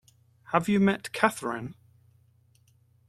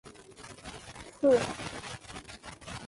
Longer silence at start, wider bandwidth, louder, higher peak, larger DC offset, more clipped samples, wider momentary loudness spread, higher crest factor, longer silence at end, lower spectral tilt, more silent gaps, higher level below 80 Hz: first, 0.5 s vs 0.05 s; first, 14 kHz vs 11.5 kHz; first, -27 LUFS vs -30 LUFS; first, -4 dBFS vs -14 dBFS; neither; neither; second, 12 LU vs 22 LU; first, 26 dB vs 20 dB; first, 1.35 s vs 0 s; about the same, -5.5 dB/octave vs -4.5 dB/octave; neither; second, -68 dBFS vs -58 dBFS